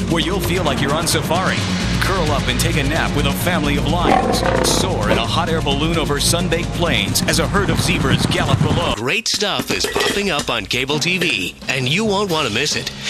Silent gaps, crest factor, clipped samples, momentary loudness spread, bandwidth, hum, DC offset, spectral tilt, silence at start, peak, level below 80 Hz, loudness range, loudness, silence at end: none; 14 dB; under 0.1%; 3 LU; 14 kHz; none; under 0.1%; -4 dB/octave; 0 s; -2 dBFS; -30 dBFS; 1 LU; -17 LUFS; 0 s